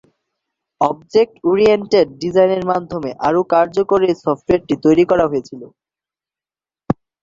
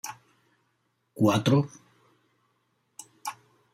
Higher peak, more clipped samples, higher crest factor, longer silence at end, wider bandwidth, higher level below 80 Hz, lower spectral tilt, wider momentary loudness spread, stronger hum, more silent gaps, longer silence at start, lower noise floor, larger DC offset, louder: first, -2 dBFS vs -10 dBFS; neither; second, 16 dB vs 22 dB; about the same, 0.3 s vs 0.4 s; second, 7.6 kHz vs 16 kHz; first, -48 dBFS vs -72 dBFS; about the same, -7 dB/octave vs -6 dB/octave; second, 11 LU vs 25 LU; neither; neither; first, 0.8 s vs 0.05 s; first, under -90 dBFS vs -74 dBFS; neither; first, -16 LUFS vs -27 LUFS